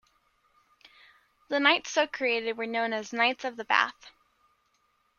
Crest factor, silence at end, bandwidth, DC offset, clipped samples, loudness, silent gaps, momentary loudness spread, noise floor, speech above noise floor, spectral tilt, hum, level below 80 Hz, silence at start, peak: 26 dB; 1.1 s; 7.2 kHz; under 0.1%; under 0.1%; -27 LUFS; none; 8 LU; -71 dBFS; 44 dB; -1.5 dB/octave; none; -78 dBFS; 1.5 s; -6 dBFS